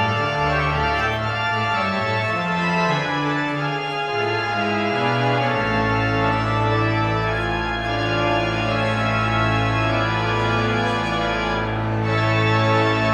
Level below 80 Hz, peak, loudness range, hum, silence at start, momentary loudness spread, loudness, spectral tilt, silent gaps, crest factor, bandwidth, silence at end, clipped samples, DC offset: -38 dBFS; -6 dBFS; 1 LU; none; 0 s; 4 LU; -20 LUFS; -6 dB/octave; none; 14 dB; 8.8 kHz; 0 s; under 0.1%; under 0.1%